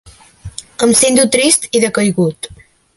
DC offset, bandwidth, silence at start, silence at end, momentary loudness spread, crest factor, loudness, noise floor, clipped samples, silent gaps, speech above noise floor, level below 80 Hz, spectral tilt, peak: under 0.1%; 16 kHz; 0.05 s; 0.4 s; 20 LU; 14 dB; -12 LUFS; -34 dBFS; under 0.1%; none; 22 dB; -46 dBFS; -3 dB/octave; 0 dBFS